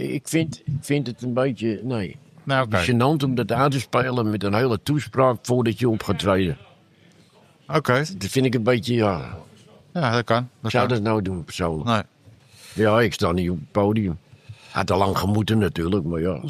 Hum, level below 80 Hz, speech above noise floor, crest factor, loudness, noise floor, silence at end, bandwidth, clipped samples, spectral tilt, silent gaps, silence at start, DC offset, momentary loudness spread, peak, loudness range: none; -48 dBFS; 32 dB; 18 dB; -22 LUFS; -54 dBFS; 0 s; 15 kHz; under 0.1%; -6 dB/octave; none; 0 s; under 0.1%; 8 LU; -4 dBFS; 3 LU